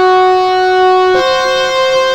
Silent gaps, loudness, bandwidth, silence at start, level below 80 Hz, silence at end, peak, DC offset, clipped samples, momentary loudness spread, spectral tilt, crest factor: none; -10 LUFS; 12 kHz; 0 s; -44 dBFS; 0 s; -2 dBFS; under 0.1%; under 0.1%; 3 LU; -3 dB/octave; 8 dB